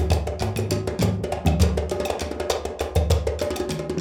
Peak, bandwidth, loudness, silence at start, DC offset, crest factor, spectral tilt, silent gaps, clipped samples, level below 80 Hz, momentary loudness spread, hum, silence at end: -6 dBFS; 17.5 kHz; -24 LUFS; 0 s; under 0.1%; 18 dB; -6 dB/octave; none; under 0.1%; -30 dBFS; 5 LU; none; 0 s